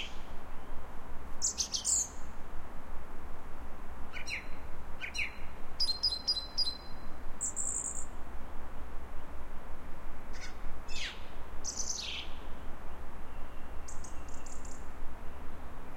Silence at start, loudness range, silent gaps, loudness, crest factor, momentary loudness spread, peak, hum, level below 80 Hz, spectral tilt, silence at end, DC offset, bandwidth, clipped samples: 0 s; 11 LU; none; -37 LUFS; 12 dB; 18 LU; -18 dBFS; none; -42 dBFS; -1 dB/octave; 0 s; under 0.1%; 10.5 kHz; under 0.1%